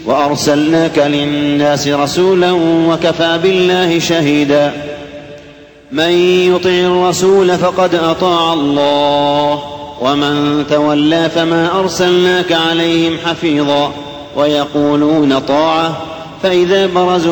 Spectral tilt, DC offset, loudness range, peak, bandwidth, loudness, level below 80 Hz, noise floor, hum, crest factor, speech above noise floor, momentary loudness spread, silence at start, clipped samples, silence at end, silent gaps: -5 dB/octave; under 0.1%; 2 LU; -2 dBFS; 19.5 kHz; -12 LUFS; -46 dBFS; -37 dBFS; none; 10 dB; 26 dB; 6 LU; 0 s; under 0.1%; 0 s; none